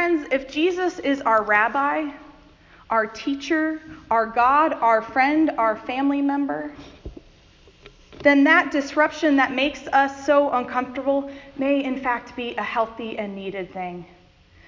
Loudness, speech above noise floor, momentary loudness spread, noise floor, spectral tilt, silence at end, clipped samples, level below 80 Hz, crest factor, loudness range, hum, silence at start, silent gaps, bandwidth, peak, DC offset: -21 LUFS; 31 dB; 13 LU; -52 dBFS; -4.5 dB/octave; 0.65 s; under 0.1%; -54 dBFS; 18 dB; 6 LU; none; 0 s; none; 7.4 kHz; -4 dBFS; under 0.1%